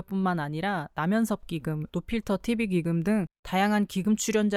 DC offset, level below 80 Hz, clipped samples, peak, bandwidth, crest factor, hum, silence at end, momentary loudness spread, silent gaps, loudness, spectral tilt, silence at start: under 0.1%; -52 dBFS; under 0.1%; -12 dBFS; 15 kHz; 14 dB; none; 0 s; 7 LU; 3.39-3.43 s; -28 LUFS; -5.5 dB/octave; 0 s